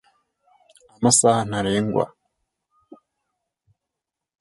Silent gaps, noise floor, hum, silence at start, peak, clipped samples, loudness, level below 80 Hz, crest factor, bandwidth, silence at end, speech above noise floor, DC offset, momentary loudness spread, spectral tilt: none; -85 dBFS; none; 1 s; -4 dBFS; under 0.1%; -20 LUFS; -56 dBFS; 22 dB; 11.5 kHz; 2.35 s; 66 dB; under 0.1%; 9 LU; -4 dB/octave